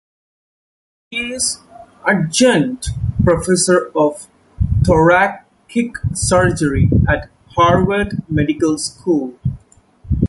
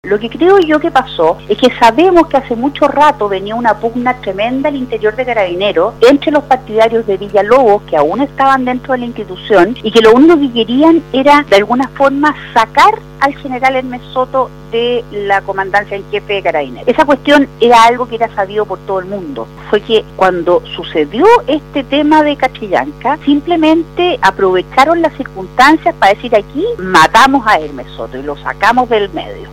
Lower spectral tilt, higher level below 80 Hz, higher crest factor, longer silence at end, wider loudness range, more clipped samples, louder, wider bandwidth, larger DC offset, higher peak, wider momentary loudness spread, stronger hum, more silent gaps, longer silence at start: about the same, -5 dB/octave vs -5 dB/octave; first, -30 dBFS vs -38 dBFS; first, 16 dB vs 10 dB; about the same, 0 s vs 0 s; about the same, 3 LU vs 4 LU; second, under 0.1% vs 1%; second, -16 LUFS vs -11 LUFS; second, 11.5 kHz vs 16 kHz; neither; about the same, -2 dBFS vs 0 dBFS; about the same, 11 LU vs 10 LU; second, none vs 50 Hz at -35 dBFS; neither; first, 1.1 s vs 0.05 s